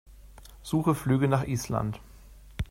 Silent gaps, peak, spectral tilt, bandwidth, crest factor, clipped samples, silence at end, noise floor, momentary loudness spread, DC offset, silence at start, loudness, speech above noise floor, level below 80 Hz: none; -10 dBFS; -7 dB/octave; 16 kHz; 18 dB; under 0.1%; 0.05 s; -50 dBFS; 19 LU; under 0.1%; 0.1 s; -28 LUFS; 23 dB; -46 dBFS